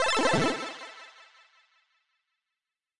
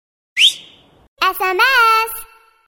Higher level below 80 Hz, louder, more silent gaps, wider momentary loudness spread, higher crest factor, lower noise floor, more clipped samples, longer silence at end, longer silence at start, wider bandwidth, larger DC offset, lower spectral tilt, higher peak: second, -58 dBFS vs -52 dBFS; second, -27 LUFS vs -14 LUFS; second, none vs 1.08-1.16 s; first, 24 LU vs 15 LU; about the same, 20 dB vs 16 dB; first, -89 dBFS vs -46 dBFS; neither; first, 1.55 s vs 0.45 s; second, 0 s vs 0.35 s; second, 11.5 kHz vs 17 kHz; neither; first, -3.5 dB/octave vs 1 dB/octave; second, -12 dBFS vs 0 dBFS